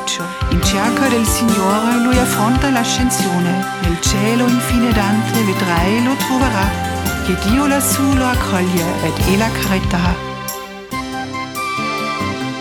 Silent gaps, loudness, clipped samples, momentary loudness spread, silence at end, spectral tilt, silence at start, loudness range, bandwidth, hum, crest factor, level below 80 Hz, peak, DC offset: none; -16 LUFS; under 0.1%; 8 LU; 0 s; -4.5 dB/octave; 0 s; 4 LU; over 20 kHz; none; 14 dB; -28 dBFS; -2 dBFS; under 0.1%